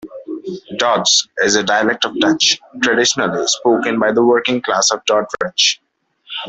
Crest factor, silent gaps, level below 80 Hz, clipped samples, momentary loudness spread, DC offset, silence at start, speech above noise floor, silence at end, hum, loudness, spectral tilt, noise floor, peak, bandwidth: 16 dB; none; -58 dBFS; under 0.1%; 13 LU; under 0.1%; 0.05 s; 25 dB; 0 s; none; -14 LUFS; -2 dB/octave; -41 dBFS; 0 dBFS; 8.4 kHz